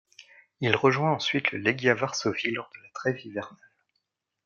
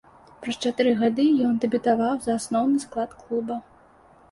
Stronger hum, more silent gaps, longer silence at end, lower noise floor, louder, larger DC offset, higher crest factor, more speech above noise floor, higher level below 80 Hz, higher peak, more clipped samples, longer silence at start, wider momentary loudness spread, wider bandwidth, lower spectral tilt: neither; neither; first, 0.9 s vs 0.7 s; first, -80 dBFS vs -54 dBFS; about the same, -26 LUFS vs -24 LUFS; neither; first, 26 dB vs 16 dB; first, 53 dB vs 31 dB; second, -72 dBFS vs -62 dBFS; first, -4 dBFS vs -8 dBFS; neither; first, 0.6 s vs 0.4 s; about the same, 14 LU vs 12 LU; second, 7.4 kHz vs 11.5 kHz; about the same, -5 dB/octave vs -5 dB/octave